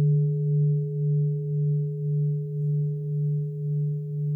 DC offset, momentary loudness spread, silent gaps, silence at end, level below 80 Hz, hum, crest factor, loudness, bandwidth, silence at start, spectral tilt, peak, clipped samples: under 0.1%; 5 LU; none; 0 s; -70 dBFS; none; 8 dB; -26 LUFS; 0.5 kHz; 0 s; -15 dB/octave; -16 dBFS; under 0.1%